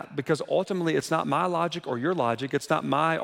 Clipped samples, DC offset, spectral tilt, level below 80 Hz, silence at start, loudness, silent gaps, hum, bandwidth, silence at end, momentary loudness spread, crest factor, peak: under 0.1%; under 0.1%; -5.5 dB/octave; -70 dBFS; 0 s; -27 LUFS; none; none; 16.5 kHz; 0 s; 4 LU; 16 dB; -10 dBFS